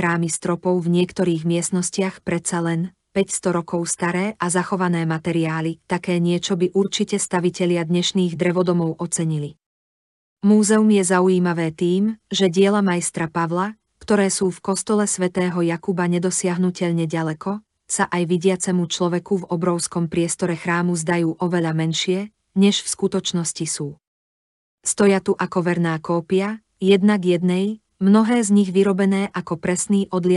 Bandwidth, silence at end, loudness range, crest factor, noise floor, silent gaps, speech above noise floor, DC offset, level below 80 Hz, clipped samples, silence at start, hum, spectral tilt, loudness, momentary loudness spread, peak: 11.5 kHz; 0 s; 4 LU; 16 dB; under -90 dBFS; 9.66-10.37 s, 24.07-24.78 s; over 70 dB; under 0.1%; -62 dBFS; under 0.1%; 0 s; none; -5 dB/octave; -20 LUFS; 8 LU; -4 dBFS